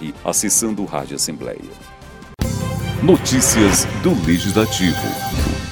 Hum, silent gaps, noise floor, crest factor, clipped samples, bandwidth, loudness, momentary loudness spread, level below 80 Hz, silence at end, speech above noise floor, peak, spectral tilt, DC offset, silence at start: none; none; -38 dBFS; 18 dB; under 0.1%; 19.5 kHz; -17 LUFS; 11 LU; -32 dBFS; 0 s; 21 dB; 0 dBFS; -4 dB/octave; under 0.1%; 0 s